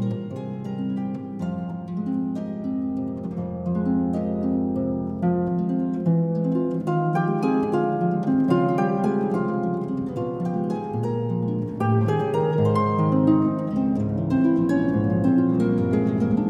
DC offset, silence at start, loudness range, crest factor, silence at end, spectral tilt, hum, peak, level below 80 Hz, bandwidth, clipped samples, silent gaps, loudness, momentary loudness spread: under 0.1%; 0 s; 6 LU; 16 dB; 0 s; -10 dB/octave; none; -6 dBFS; -54 dBFS; 9 kHz; under 0.1%; none; -23 LUFS; 9 LU